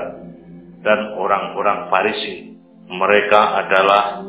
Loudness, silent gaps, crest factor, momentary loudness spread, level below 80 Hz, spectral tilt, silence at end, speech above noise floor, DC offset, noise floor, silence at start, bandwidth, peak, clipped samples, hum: -16 LUFS; none; 18 dB; 17 LU; -58 dBFS; -7.5 dB/octave; 0 s; 23 dB; under 0.1%; -39 dBFS; 0 s; 4 kHz; 0 dBFS; under 0.1%; none